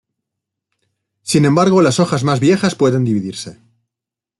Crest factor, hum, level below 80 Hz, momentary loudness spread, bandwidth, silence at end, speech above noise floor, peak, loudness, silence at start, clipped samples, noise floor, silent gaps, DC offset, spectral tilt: 14 dB; none; -56 dBFS; 16 LU; 12 kHz; 0.85 s; 72 dB; -2 dBFS; -14 LUFS; 1.25 s; under 0.1%; -86 dBFS; none; under 0.1%; -6 dB/octave